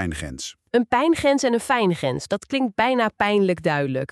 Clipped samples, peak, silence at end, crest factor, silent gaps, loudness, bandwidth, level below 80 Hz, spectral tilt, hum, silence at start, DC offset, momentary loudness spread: under 0.1%; -4 dBFS; 0.05 s; 16 dB; none; -21 LUFS; 13 kHz; -48 dBFS; -5 dB/octave; none; 0 s; under 0.1%; 9 LU